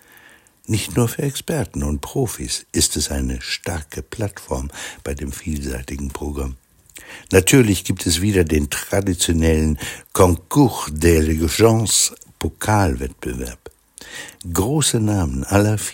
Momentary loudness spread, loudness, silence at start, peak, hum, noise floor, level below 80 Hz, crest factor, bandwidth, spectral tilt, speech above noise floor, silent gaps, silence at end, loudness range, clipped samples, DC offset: 14 LU; -19 LUFS; 0.7 s; 0 dBFS; none; -49 dBFS; -34 dBFS; 20 dB; 17 kHz; -4.5 dB/octave; 30 dB; none; 0 s; 9 LU; under 0.1%; under 0.1%